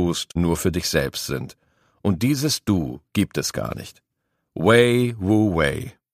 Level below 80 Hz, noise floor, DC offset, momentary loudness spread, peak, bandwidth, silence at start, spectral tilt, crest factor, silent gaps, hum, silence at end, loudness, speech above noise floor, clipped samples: -42 dBFS; -76 dBFS; under 0.1%; 14 LU; -2 dBFS; 15.5 kHz; 0 s; -5 dB/octave; 20 dB; none; none; 0.2 s; -21 LUFS; 55 dB; under 0.1%